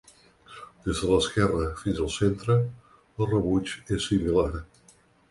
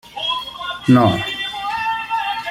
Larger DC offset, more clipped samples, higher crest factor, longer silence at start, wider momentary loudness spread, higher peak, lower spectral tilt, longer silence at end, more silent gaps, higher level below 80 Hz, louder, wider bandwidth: neither; neither; about the same, 18 dB vs 18 dB; first, 0.5 s vs 0.05 s; first, 12 LU vs 9 LU; second, -8 dBFS vs -2 dBFS; about the same, -6 dB/octave vs -6 dB/octave; first, 0.65 s vs 0 s; neither; first, -42 dBFS vs -50 dBFS; second, -26 LUFS vs -19 LUFS; second, 11.5 kHz vs 16 kHz